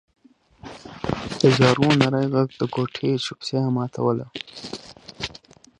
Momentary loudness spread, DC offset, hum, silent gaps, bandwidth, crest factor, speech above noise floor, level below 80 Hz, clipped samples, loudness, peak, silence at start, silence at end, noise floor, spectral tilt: 19 LU; under 0.1%; none; none; 10.5 kHz; 22 dB; 28 dB; -52 dBFS; under 0.1%; -22 LUFS; -2 dBFS; 0.65 s; 0.4 s; -49 dBFS; -6 dB/octave